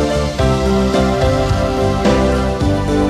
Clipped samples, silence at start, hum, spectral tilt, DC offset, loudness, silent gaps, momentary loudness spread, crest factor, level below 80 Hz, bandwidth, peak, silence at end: under 0.1%; 0 s; none; -6.5 dB/octave; under 0.1%; -15 LUFS; none; 2 LU; 12 dB; -22 dBFS; 14 kHz; -2 dBFS; 0 s